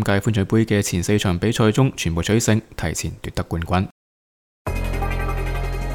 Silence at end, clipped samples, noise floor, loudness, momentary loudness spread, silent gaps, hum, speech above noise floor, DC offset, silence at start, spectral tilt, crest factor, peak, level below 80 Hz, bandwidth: 0 s; under 0.1%; under -90 dBFS; -21 LUFS; 9 LU; 3.91-4.65 s; none; over 70 dB; under 0.1%; 0 s; -5.5 dB/octave; 18 dB; -2 dBFS; -30 dBFS; 18 kHz